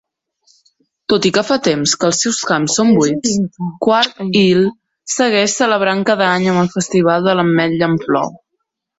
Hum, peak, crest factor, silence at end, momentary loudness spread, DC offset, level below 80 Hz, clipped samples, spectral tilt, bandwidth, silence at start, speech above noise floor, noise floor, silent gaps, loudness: none; 0 dBFS; 14 dB; 0.6 s; 6 LU; under 0.1%; -54 dBFS; under 0.1%; -4 dB/octave; 8.2 kHz; 1.1 s; 59 dB; -73 dBFS; none; -14 LUFS